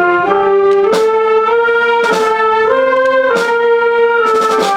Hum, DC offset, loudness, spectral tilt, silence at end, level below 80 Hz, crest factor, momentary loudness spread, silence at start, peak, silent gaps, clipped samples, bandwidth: none; under 0.1%; -11 LUFS; -4 dB/octave; 0 s; -52 dBFS; 10 dB; 1 LU; 0 s; 0 dBFS; none; under 0.1%; 13.5 kHz